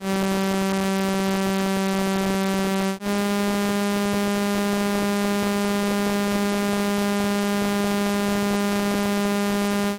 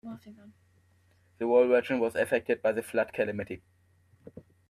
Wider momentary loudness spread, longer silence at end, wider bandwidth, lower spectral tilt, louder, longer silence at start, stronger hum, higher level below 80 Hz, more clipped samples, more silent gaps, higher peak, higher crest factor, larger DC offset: second, 0 LU vs 19 LU; second, 0 s vs 0.3 s; first, 16.5 kHz vs 14 kHz; about the same, -5 dB/octave vs -6 dB/octave; first, -23 LUFS vs -28 LUFS; about the same, 0 s vs 0.05 s; neither; first, -50 dBFS vs -70 dBFS; neither; neither; about the same, -12 dBFS vs -12 dBFS; second, 10 dB vs 18 dB; neither